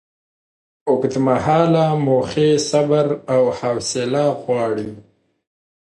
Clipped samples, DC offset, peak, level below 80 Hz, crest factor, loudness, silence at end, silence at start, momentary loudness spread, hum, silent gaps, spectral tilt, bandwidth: under 0.1%; under 0.1%; -2 dBFS; -54 dBFS; 16 dB; -18 LUFS; 0.95 s; 0.85 s; 6 LU; none; none; -6 dB/octave; 11.5 kHz